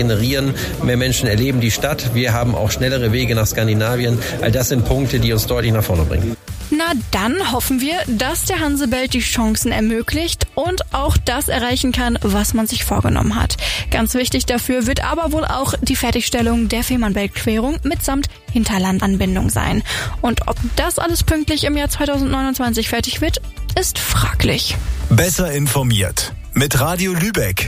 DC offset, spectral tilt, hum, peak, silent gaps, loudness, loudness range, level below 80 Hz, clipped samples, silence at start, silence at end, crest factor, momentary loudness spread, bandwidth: under 0.1%; -4.5 dB/octave; none; -2 dBFS; none; -17 LUFS; 1 LU; -26 dBFS; under 0.1%; 0 s; 0 s; 14 dB; 3 LU; 16 kHz